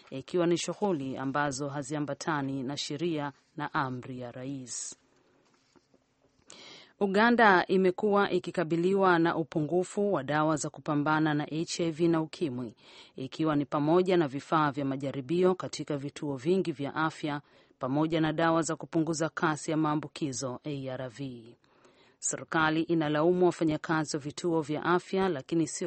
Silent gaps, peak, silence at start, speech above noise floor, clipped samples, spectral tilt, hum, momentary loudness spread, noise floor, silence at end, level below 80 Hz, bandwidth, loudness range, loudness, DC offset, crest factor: none; -8 dBFS; 0.1 s; 40 dB; under 0.1%; -5 dB/octave; none; 13 LU; -69 dBFS; 0 s; -68 dBFS; 8.8 kHz; 8 LU; -29 LUFS; under 0.1%; 22 dB